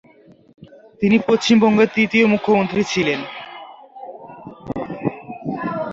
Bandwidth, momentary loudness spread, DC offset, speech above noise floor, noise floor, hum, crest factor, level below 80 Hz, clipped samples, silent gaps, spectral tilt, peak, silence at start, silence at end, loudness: 7.6 kHz; 23 LU; under 0.1%; 33 dB; -49 dBFS; none; 18 dB; -56 dBFS; under 0.1%; none; -5.5 dB/octave; -2 dBFS; 1 s; 0 s; -18 LUFS